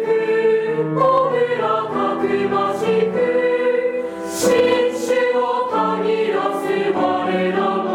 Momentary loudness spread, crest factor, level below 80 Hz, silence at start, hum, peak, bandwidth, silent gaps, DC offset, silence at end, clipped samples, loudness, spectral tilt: 4 LU; 12 dB; -60 dBFS; 0 s; none; -6 dBFS; 17 kHz; none; under 0.1%; 0 s; under 0.1%; -18 LUFS; -5 dB/octave